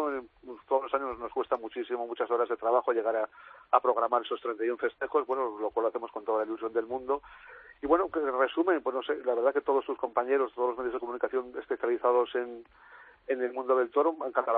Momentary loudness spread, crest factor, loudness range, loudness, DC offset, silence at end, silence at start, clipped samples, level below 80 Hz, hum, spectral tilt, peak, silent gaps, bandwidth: 9 LU; 22 dB; 3 LU; -30 LUFS; under 0.1%; 0 s; 0 s; under 0.1%; -68 dBFS; none; -7.5 dB/octave; -8 dBFS; none; 4.1 kHz